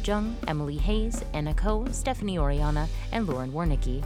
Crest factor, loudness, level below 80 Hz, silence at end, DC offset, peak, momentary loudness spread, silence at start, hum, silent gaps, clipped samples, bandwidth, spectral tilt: 16 dB; -29 LUFS; -30 dBFS; 0 s; under 0.1%; -10 dBFS; 3 LU; 0 s; none; none; under 0.1%; 12.5 kHz; -6 dB/octave